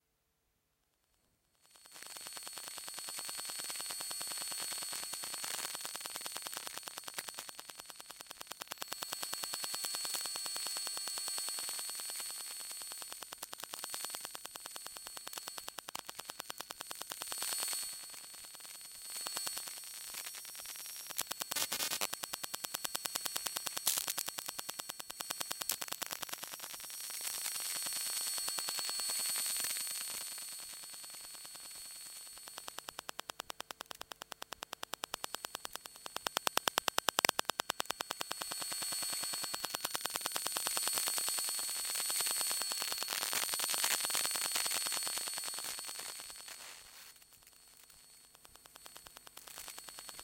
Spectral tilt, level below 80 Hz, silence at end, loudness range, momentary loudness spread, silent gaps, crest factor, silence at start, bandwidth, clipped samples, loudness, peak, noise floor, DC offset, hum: 1.5 dB/octave; -78 dBFS; 0 s; 11 LU; 14 LU; none; 36 dB; 1.7 s; 17 kHz; under 0.1%; -38 LUFS; -4 dBFS; -81 dBFS; under 0.1%; none